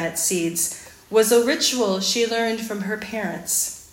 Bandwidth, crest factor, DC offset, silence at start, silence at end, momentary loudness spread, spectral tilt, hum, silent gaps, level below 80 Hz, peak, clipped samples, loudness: 16.5 kHz; 18 dB; under 0.1%; 0 s; 0.05 s; 10 LU; -2.5 dB/octave; none; none; -60 dBFS; -4 dBFS; under 0.1%; -21 LUFS